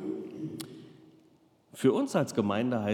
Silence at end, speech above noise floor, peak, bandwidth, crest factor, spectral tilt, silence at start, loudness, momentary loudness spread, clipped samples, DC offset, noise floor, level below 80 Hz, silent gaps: 0 s; 36 dB; -12 dBFS; 17.5 kHz; 20 dB; -6 dB/octave; 0 s; -30 LUFS; 18 LU; under 0.1%; under 0.1%; -64 dBFS; -82 dBFS; none